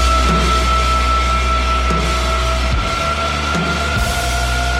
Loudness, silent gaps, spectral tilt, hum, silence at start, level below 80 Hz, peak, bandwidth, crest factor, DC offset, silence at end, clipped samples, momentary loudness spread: -16 LUFS; none; -4 dB/octave; none; 0 s; -18 dBFS; -4 dBFS; 15 kHz; 12 dB; under 0.1%; 0 s; under 0.1%; 3 LU